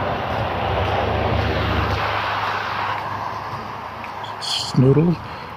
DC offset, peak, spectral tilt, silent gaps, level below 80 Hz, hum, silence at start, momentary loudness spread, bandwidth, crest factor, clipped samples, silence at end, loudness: under 0.1%; -4 dBFS; -6 dB/octave; none; -34 dBFS; none; 0 s; 13 LU; 15.5 kHz; 18 dB; under 0.1%; 0 s; -21 LUFS